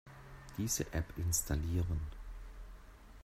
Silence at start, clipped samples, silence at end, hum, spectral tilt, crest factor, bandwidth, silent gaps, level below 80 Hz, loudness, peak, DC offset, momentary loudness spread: 0.05 s; under 0.1%; 0 s; none; -4.5 dB/octave; 18 dB; 16 kHz; none; -46 dBFS; -37 LUFS; -22 dBFS; under 0.1%; 21 LU